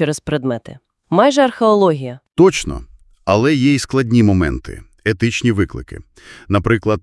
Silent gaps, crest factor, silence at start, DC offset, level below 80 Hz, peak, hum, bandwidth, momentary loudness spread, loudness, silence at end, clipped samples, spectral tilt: none; 16 dB; 0 s; under 0.1%; -38 dBFS; 0 dBFS; none; 12 kHz; 14 LU; -16 LUFS; 0.05 s; under 0.1%; -6 dB/octave